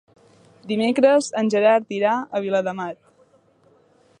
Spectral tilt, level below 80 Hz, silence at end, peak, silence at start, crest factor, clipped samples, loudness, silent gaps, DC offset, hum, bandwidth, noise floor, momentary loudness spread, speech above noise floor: -5 dB/octave; -74 dBFS; 1.25 s; -4 dBFS; 0.65 s; 18 dB; under 0.1%; -20 LUFS; none; under 0.1%; none; 10.5 kHz; -58 dBFS; 12 LU; 38 dB